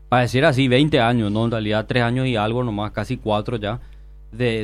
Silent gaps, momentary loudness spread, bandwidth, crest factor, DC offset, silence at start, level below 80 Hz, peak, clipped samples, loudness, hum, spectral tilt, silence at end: none; 10 LU; 12.5 kHz; 16 dB; under 0.1%; 0 s; -40 dBFS; -4 dBFS; under 0.1%; -20 LUFS; none; -6.5 dB/octave; 0 s